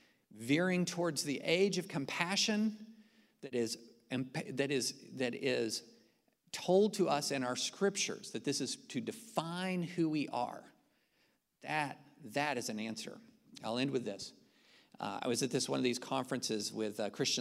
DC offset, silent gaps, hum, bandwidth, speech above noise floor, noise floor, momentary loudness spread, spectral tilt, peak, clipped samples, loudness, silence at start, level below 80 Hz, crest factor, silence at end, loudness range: under 0.1%; none; none; 16 kHz; 40 dB; -76 dBFS; 11 LU; -4 dB/octave; -14 dBFS; under 0.1%; -36 LUFS; 0.3 s; -82 dBFS; 22 dB; 0 s; 5 LU